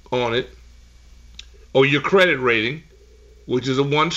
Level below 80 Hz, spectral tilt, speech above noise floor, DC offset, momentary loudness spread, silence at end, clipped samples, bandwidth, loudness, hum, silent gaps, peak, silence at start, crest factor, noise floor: -48 dBFS; -5.5 dB/octave; 29 dB; under 0.1%; 10 LU; 0 s; under 0.1%; 9.2 kHz; -19 LUFS; 60 Hz at -50 dBFS; none; -4 dBFS; 0.1 s; 16 dB; -48 dBFS